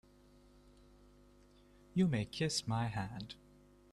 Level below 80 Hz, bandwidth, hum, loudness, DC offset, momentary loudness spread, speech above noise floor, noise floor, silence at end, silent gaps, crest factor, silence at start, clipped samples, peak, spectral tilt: -64 dBFS; 13 kHz; 50 Hz at -60 dBFS; -37 LUFS; under 0.1%; 15 LU; 28 dB; -64 dBFS; 0.55 s; none; 20 dB; 1.95 s; under 0.1%; -22 dBFS; -5 dB/octave